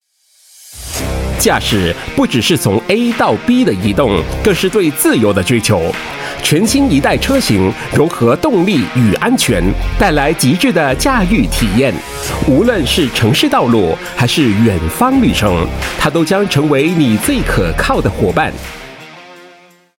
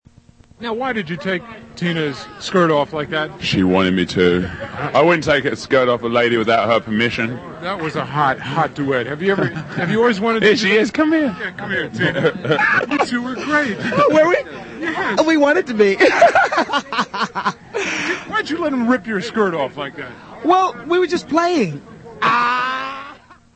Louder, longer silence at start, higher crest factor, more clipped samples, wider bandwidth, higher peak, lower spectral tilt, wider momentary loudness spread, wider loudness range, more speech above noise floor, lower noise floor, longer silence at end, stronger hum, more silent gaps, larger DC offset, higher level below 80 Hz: first, -12 LUFS vs -17 LUFS; about the same, 0.65 s vs 0.6 s; second, 12 dB vs 18 dB; neither; first, 17 kHz vs 8.8 kHz; about the same, 0 dBFS vs 0 dBFS; about the same, -5 dB/octave vs -5.5 dB/octave; second, 6 LU vs 10 LU; second, 1 LU vs 4 LU; first, 39 dB vs 31 dB; about the same, -51 dBFS vs -48 dBFS; first, 0.55 s vs 0.4 s; neither; neither; neither; first, -26 dBFS vs -52 dBFS